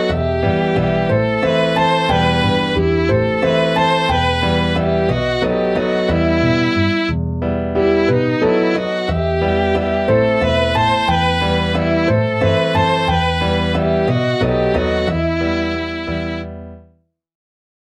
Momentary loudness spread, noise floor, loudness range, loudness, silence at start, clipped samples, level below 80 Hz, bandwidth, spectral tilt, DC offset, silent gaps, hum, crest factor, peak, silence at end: 4 LU; -55 dBFS; 2 LU; -16 LUFS; 0 s; under 0.1%; -32 dBFS; 10.5 kHz; -6.5 dB/octave; under 0.1%; none; none; 14 dB; -2 dBFS; 1.1 s